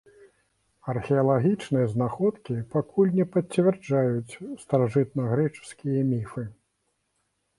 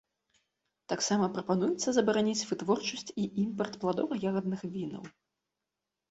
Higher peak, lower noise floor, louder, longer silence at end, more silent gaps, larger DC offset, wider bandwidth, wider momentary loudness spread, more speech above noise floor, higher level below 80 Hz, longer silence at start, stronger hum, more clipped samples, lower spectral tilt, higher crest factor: first, -8 dBFS vs -12 dBFS; second, -75 dBFS vs -88 dBFS; first, -26 LUFS vs -31 LUFS; about the same, 1.05 s vs 1 s; neither; neither; first, 11.5 kHz vs 8.2 kHz; first, 13 LU vs 10 LU; second, 50 dB vs 57 dB; first, -62 dBFS vs -70 dBFS; about the same, 0.85 s vs 0.9 s; neither; neither; first, -8.5 dB/octave vs -4.5 dB/octave; about the same, 18 dB vs 20 dB